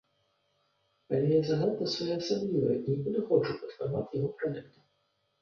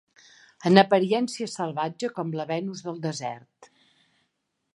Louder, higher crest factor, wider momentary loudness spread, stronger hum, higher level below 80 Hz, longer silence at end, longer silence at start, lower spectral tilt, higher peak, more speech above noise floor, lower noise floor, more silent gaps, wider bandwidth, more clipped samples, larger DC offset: second, -31 LUFS vs -25 LUFS; second, 18 dB vs 26 dB; second, 9 LU vs 15 LU; neither; first, -66 dBFS vs -74 dBFS; second, 0.75 s vs 1.1 s; first, 1.1 s vs 0.6 s; first, -7 dB/octave vs -5.5 dB/octave; second, -14 dBFS vs -2 dBFS; second, 46 dB vs 52 dB; about the same, -76 dBFS vs -77 dBFS; neither; second, 7 kHz vs 11.5 kHz; neither; neither